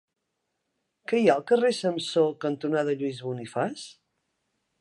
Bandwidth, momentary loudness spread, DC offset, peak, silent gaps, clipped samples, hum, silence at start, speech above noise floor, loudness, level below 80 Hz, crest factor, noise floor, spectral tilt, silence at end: 11.5 kHz; 12 LU; under 0.1%; -6 dBFS; none; under 0.1%; none; 1.1 s; 55 dB; -26 LUFS; -78 dBFS; 20 dB; -80 dBFS; -5.5 dB/octave; 0.9 s